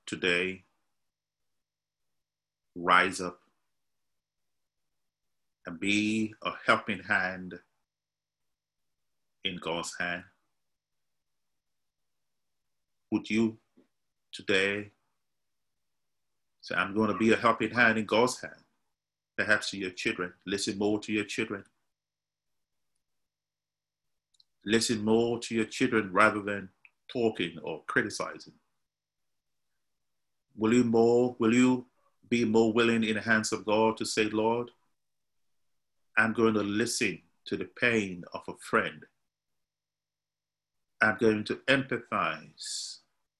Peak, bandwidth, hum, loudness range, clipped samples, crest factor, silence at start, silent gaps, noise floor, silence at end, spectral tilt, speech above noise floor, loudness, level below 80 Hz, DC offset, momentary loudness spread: -8 dBFS; 12.5 kHz; 50 Hz at -65 dBFS; 10 LU; under 0.1%; 24 dB; 0.05 s; none; under -90 dBFS; 0.45 s; -4 dB/octave; over 62 dB; -28 LUFS; -66 dBFS; under 0.1%; 14 LU